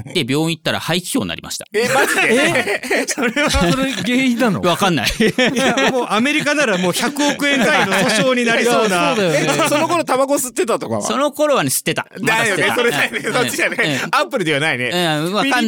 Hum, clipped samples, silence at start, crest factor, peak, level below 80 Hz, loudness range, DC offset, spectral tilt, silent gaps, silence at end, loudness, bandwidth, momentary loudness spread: none; under 0.1%; 0 s; 14 dB; -2 dBFS; -40 dBFS; 2 LU; under 0.1%; -3.5 dB/octave; none; 0 s; -16 LUFS; 19.5 kHz; 5 LU